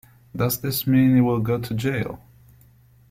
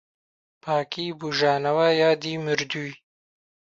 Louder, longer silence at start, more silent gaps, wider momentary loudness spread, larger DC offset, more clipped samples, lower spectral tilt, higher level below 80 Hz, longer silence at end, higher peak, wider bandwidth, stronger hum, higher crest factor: about the same, -22 LUFS vs -24 LUFS; second, 0.35 s vs 0.65 s; neither; first, 15 LU vs 11 LU; neither; neither; first, -6.5 dB/octave vs -4.5 dB/octave; first, -52 dBFS vs -68 dBFS; first, 0.95 s vs 0.75 s; about the same, -6 dBFS vs -8 dBFS; first, 16.5 kHz vs 7.8 kHz; neither; about the same, 16 dB vs 18 dB